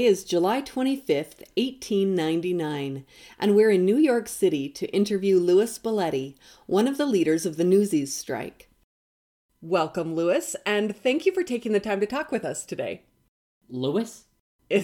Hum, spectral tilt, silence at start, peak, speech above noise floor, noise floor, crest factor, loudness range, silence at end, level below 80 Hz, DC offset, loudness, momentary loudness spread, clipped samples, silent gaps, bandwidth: none; -5 dB/octave; 0 s; -10 dBFS; over 66 dB; under -90 dBFS; 16 dB; 5 LU; 0 s; -66 dBFS; under 0.1%; -25 LUFS; 12 LU; under 0.1%; 8.84-9.49 s, 13.29-13.61 s, 14.40-14.59 s; 18 kHz